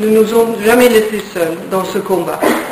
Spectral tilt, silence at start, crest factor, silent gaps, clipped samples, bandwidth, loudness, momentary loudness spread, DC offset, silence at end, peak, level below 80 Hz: -4.5 dB/octave; 0 s; 12 dB; none; under 0.1%; 16 kHz; -13 LUFS; 9 LU; under 0.1%; 0 s; 0 dBFS; -48 dBFS